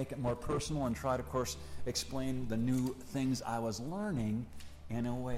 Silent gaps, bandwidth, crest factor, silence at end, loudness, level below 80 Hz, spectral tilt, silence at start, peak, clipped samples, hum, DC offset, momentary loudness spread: none; 16 kHz; 14 dB; 0 s; -37 LUFS; -50 dBFS; -5.5 dB/octave; 0 s; -22 dBFS; under 0.1%; none; under 0.1%; 6 LU